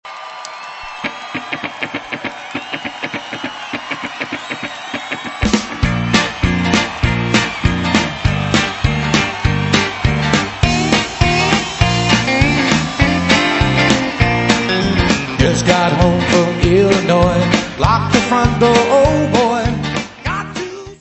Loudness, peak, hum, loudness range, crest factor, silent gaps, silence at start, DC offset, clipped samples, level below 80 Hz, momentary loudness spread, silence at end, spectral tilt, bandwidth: -15 LUFS; 0 dBFS; none; 10 LU; 16 dB; none; 0.05 s; under 0.1%; under 0.1%; -28 dBFS; 12 LU; 0.05 s; -5 dB/octave; 8.4 kHz